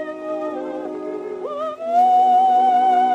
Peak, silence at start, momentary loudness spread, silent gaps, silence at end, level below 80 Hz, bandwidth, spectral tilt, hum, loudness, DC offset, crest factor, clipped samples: -8 dBFS; 0 s; 14 LU; none; 0 s; -70 dBFS; 8 kHz; -4.5 dB/octave; none; -19 LUFS; under 0.1%; 10 dB; under 0.1%